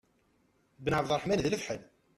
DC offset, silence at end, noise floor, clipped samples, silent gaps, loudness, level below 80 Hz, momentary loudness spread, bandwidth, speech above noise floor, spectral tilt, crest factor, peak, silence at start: under 0.1%; 0.35 s; -71 dBFS; under 0.1%; none; -32 LUFS; -58 dBFS; 10 LU; 14 kHz; 39 dB; -5 dB/octave; 18 dB; -16 dBFS; 0.8 s